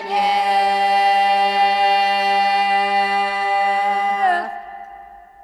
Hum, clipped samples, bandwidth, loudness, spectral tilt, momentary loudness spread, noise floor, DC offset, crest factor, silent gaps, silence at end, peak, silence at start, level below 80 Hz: none; under 0.1%; 12 kHz; -17 LUFS; -2.5 dB/octave; 5 LU; -40 dBFS; under 0.1%; 12 dB; none; 0.25 s; -6 dBFS; 0 s; -60 dBFS